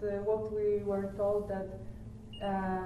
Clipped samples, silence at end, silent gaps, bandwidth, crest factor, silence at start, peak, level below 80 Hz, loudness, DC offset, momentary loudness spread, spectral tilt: under 0.1%; 0 s; none; 11.5 kHz; 14 dB; 0 s; -20 dBFS; -52 dBFS; -34 LUFS; under 0.1%; 15 LU; -8 dB/octave